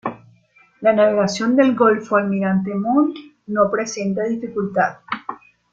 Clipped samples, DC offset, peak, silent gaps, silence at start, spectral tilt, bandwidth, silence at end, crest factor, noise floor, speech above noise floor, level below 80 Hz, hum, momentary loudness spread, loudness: under 0.1%; under 0.1%; -2 dBFS; none; 0.05 s; -6 dB/octave; 7.8 kHz; 0.35 s; 16 dB; -55 dBFS; 37 dB; -62 dBFS; none; 13 LU; -19 LUFS